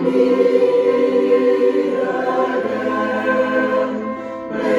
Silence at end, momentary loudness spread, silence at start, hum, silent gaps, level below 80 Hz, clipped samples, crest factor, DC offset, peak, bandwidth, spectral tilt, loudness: 0 s; 8 LU; 0 s; none; none; -60 dBFS; under 0.1%; 14 dB; under 0.1%; -2 dBFS; 7.6 kHz; -6.5 dB/octave; -17 LUFS